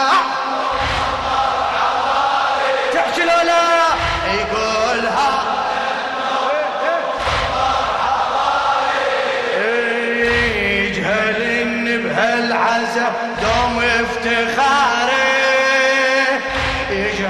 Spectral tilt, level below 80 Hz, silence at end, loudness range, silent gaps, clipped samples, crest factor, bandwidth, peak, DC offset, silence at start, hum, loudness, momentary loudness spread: -3.5 dB/octave; -38 dBFS; 0 s; 3 LU; none; under 0.1%; 16 dB; 13 kHz; -2 dBFS; under 0.1%; 0 s; none; -16 LUFS; 5 LU